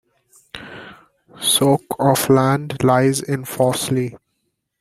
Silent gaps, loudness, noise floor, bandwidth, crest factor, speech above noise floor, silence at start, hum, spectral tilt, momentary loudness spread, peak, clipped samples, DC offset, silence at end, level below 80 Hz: none; -17 LUFS; -72 dBFS; 16 kHz; 18 dB; 55 dB; 0.55 s; none; -4.5 dB/octave; 21 LU; -2 dBFS; under 0.1%; under 0.1%; 0.65 s; -54 dBFS